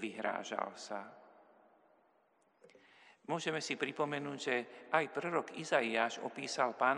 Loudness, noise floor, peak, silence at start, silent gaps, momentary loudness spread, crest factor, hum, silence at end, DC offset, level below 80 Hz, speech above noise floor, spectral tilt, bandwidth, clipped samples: -37 LUFS; -73 dBFS; -16 dBFS; 0 s; none; 10 LU; 24 dB; none; 0 s; under 0.1%; under -90 dBFS; 36 dB; -3.5 dB/octave; 11.5 kHz; under 0.1%